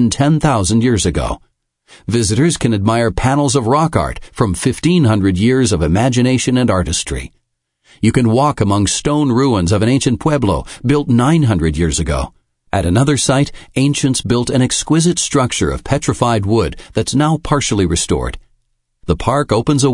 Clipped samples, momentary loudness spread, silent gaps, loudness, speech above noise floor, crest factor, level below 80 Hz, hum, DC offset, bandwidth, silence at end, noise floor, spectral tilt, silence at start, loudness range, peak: under 0.1%; 7 LU; none; -14 LUFS; 51 dB; 14 dB; -32 dBFS; none; under 0.1%; 11 kHz; 0 s; -65 dBFS; -5.5 dB/octave; 0 s; 2 LU; 0 dBFS